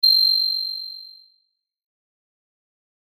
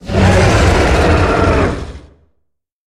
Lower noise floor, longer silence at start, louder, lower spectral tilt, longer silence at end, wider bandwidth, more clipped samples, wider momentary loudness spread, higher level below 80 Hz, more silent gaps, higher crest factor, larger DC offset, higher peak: about the same, -70 dBFS vs -67 dBFS; about the same, 0.05 s vs 0.05 s; second, -17 LUFS vs -11 LUFS; second, 7 dB/octave vs -6 dB/octave; first, 2.05 s vs 0.85 s; first, over 20 kHz vs 12.5 kHz; neither; first, 20 LU vs 10 LU; second, under -90 dBFS vs -20 dBFS; neither; about the same, 16 dB vs 12 dB; neither; second, -8 dBFS vs 0 dBFS